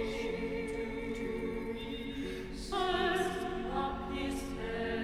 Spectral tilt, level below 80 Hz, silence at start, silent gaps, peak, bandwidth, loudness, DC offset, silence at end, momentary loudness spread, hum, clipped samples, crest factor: -5 dB/octave; -48 dBFS; 0 s; none; -18 dBFS; 15 kHz; -36 LUFS; under 0.1%; 0 s; 8 LU; none; under 0.1%; 16 dB